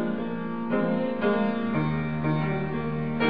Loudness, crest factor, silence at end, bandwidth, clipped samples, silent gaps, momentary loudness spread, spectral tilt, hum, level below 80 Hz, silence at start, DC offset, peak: -27 LUFS; 16 dB; 0 s; 5.2 kHz; under 0.1%; none; 5 LU; -10.5 dB/octave; none; -52 dBFS; 0 s; 0.9%; -12 dBFS